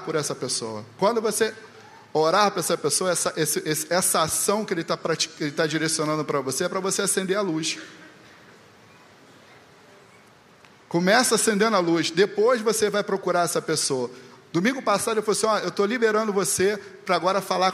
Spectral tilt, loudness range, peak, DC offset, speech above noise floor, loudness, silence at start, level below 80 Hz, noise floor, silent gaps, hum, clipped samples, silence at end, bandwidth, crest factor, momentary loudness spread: -3 dB/octave; 6 LU; -4 dBFS; under 0.1%; 29 dB; -23 LUFS; 0 s; -70 dBFS; -53 dBFS; none; none; under 0.1%; 0 s; 15 kHz; 20 dB; 7 LU